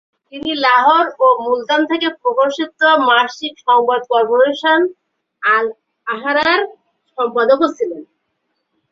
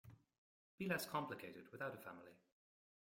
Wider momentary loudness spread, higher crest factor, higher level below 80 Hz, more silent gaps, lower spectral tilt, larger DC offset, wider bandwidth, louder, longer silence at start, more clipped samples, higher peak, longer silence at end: second, 12 LU vs 19 LU; second, 14 dB vs 24 dB; first, -64 dBFS vs -84 dBFS; second, none vs 0.38-0.78 s; second, -3 dB/octave vs -4.5 dB/octave; neither; second, 7.4 kHz vs 16.5 kHz; first, -15 LUFS vs -47 LUFS; first, 0.35 s vs 0.05 s; neither; first, -2 dBFS vs -26 dBFS; first, 0.85 s vs 0.7 s